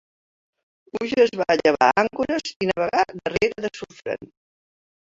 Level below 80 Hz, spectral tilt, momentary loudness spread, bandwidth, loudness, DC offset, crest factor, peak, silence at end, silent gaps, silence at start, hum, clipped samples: -56 dBFS; -4.5 dB/octave; 14 LU; 7.8 kHz; -22 LUFS; under 0.1%; 20 dB; -2 dBFS; 0.9 s; 2.56-2.60 s; 0.95 s; none; under 0.1%